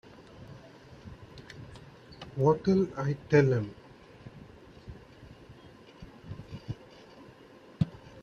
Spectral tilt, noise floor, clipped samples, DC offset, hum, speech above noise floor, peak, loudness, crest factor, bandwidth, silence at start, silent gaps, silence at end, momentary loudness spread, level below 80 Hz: -8 dB/octave; -54 dBFS; under 0.1%; under 0.1%; none; 28 dB; -10 dBFS; -29 LUFS; 24 dB; 7.2 kHz; 0.4 s; none; 0 s; 27 LU; -58 dBFS